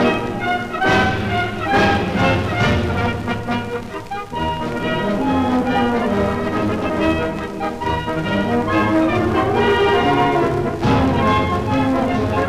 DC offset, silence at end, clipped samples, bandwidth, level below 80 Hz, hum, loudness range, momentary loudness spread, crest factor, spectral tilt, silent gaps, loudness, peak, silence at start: under 0.1%; 0 s; under 0.1%; 15.5 kHz; -36 dBFS; none; 4 LU; 8 LU; 12 dB; -6.5 dB/octave; none; -18 LUFS; -6 dBFS; 0 s